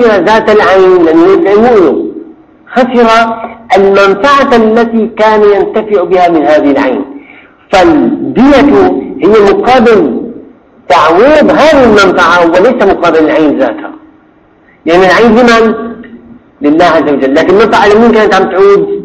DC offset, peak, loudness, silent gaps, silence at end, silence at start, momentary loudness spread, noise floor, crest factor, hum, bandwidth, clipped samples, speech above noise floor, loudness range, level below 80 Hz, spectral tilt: under 0.1%; 0 dBFS; -5 LUFS; none; 0 s; 0 s; 9 LU; -42 dBFS; 6 dB; none; 9.8 kHz; 5%; 38 dB; 2 LU; -36 dBFS; -5.5 dB/octave